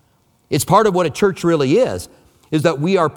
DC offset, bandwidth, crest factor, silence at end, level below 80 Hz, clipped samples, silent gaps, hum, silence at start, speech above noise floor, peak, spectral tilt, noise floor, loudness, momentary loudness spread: under 0.1%; 19 kHz; 16 dB; 0 s; -50 dBFS; under 0.1%; none; none; 0.5 s; 43 dB; 0 dBFS; -5.5 dB/octave; -58 dBFS; -16 LUFS; 9 LU